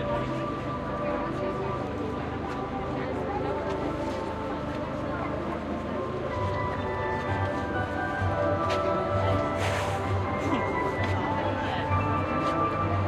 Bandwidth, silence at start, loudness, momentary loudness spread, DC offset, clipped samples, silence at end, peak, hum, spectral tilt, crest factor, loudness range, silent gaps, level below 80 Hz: 12 kHz; 0 s; -29 LUFS; 6 LU; under 0.1%; under 0.1%; 0 s; -14 dBFS; none; -7 dB/octave; 14 dB; 4 LU; none; -46 dBFS